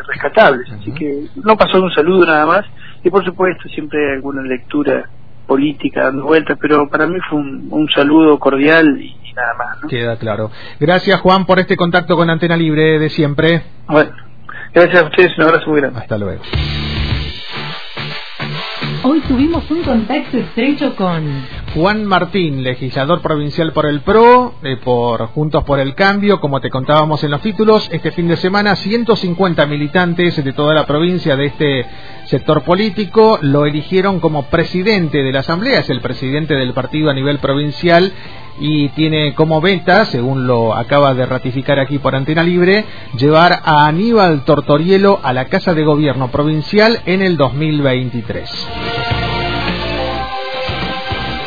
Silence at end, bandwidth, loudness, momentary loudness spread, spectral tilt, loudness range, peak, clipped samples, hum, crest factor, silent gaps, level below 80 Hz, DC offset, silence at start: 0 s; 5.4 kHz; -13 LUFS; 11 LU; -8 dB/octave; 5 LU; 0 dBFS; 0.1%; none; 14 dB; none; -36 dBFS; 3%; 0 s